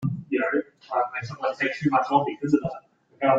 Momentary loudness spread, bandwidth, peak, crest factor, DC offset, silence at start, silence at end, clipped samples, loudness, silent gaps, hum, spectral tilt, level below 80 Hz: 8 LU; 7.8 kHz; -6 dBFS; 20 dB; under 0.1%; 0 s; 0 s; under 0.1%; -25 LUFS; none; none; -7.5 dB/octave; -64 dBFS